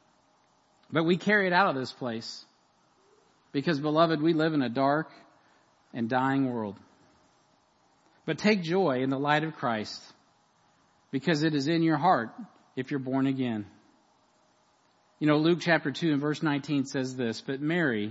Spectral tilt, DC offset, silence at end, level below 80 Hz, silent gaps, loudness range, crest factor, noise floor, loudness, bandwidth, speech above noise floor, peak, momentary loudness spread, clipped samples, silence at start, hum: -6.5 dB/octave; under 0.1%; 0 s; -78 dBFS; none; 3 LU; 20 dB; -66 dBFS; -28 LUFS; 8 kHz; 39 dB; -8 dBFS; 14 LU; under 0.1%; 0.9 s; none